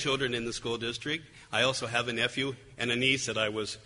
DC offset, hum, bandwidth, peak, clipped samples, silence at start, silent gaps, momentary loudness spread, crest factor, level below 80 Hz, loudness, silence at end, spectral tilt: under 0.1%; none; 11 kHz; -12 dBFS; under 0.1%; 0 s; none; 8 LU; 20 dB; -60 dBFS; -30 LUFS; 0 s; -3 dB/octave